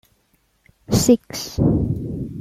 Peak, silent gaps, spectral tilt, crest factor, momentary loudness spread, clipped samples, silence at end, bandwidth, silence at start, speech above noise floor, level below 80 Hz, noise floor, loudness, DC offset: -2 dBFS; none; -6 dB/octave; 18 dB; 11 LU; under 0.1%; 0 s; 16 kHz; 0.9 s; 44 dB; -36 dBFS; -64 dBFS; -20 LUFS; under 0.1%